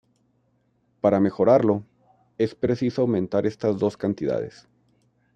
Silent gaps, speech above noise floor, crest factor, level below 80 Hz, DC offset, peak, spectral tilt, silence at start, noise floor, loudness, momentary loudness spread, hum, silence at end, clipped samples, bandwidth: none; 45 dB; 20 dB; -60 dBFS; under 0.1%; -4 dBFS; -8.5 dB/octave; 1.05 s; -67 dBFS; -23 LUFS; 9 LU; none; 0.85 s; under 0.1%; 9 kHz